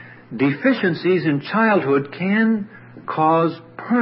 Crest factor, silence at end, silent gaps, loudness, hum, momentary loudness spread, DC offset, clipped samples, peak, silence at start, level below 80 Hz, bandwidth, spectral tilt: 14 dB; 0 s; none; -19 LUFS; none; 14 LU; under 0.1%; under 0.1%; -4 dBFS; 0 s; -68 dBFS; 5.8 kHz; -11.5 dB/octave